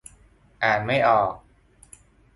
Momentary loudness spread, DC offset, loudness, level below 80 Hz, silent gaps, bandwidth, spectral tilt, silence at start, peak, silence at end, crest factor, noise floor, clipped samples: 9 LU; under 0.1%; -22 LUFS; -56 dBFS; none; 11.5 kHz; -5 dB/octave; 0.6 s; -6 dBFS; 1 s; 18 dB; -55 dBFS; under 0.1%